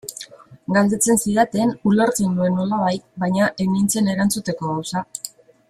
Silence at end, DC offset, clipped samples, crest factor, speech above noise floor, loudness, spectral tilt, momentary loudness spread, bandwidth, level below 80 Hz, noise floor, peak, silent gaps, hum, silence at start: 0.4 s; under 0.1%; under 0.1%; 18 dB; 22 dB; -19 LUFS; -5 dB/octave; 15 LU; 15.5 kHz; -54 dBFS; -41 dBFS; -2 dBFS; none; none; 0.05 s